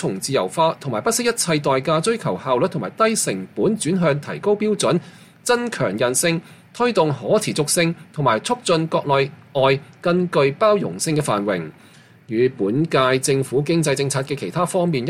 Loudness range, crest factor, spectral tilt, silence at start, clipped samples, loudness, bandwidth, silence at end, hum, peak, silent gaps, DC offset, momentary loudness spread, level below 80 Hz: 1 LU; 16 dB; -4.5 dB/octave; 0 s; under 0.1%; -20 LUFS; 16 kHz; 0 s; none; -4 dBFS; none; under 0.1%; 5 LU; -60 dBFS